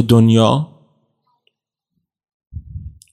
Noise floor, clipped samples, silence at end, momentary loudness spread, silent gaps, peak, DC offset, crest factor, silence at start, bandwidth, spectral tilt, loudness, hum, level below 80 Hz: -74 dBFS; under 0.1%; 0.25 s; 25 LU; 2.34-2.40 s, 2.47-2.51 s; 0 dBFS; under 0.1%; 18 dB; 0 s; 13.5 kHz; -7.5 dB/octave; -13 LUFS; none; -44 dBFS